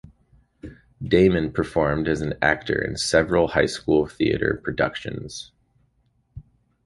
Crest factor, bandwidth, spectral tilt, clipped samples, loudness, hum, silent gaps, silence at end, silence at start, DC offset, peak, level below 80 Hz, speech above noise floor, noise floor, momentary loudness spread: 22 dB; 11.5 kHz; -5.5 dB/octave; under 0.1%; -22 LUFS; none; none; 0.45 s; 0.65 s; under 0.1%; -2 dBFS; -44 dBFS; 44 dB; -66 dBFS; 18 LU